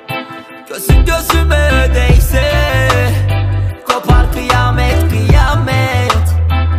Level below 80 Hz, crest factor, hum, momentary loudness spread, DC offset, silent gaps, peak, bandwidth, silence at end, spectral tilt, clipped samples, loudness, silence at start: -14 dBFS; 10 dB; none; 6 LU; under 0.1%; none; 0 dBFS; 15.5 kHz; 0 s; -5.5 dB/octave; under 0.1%; -12 LUFS; 0.1 s